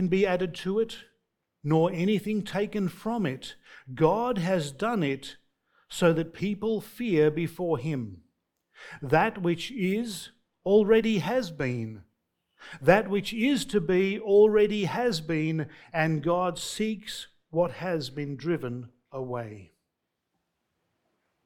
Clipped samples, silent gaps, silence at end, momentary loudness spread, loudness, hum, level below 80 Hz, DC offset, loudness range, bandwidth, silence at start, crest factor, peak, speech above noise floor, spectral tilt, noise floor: under 0.1%; none; 1.8 s; 16 LU; -27 LUFS; none; -58 dBFS; under 0.1%; 7 LU; 18 kHz; 0 s; 24 dB; -4 dBFS; 56 dB; -6 dB/octave; -82 dBFS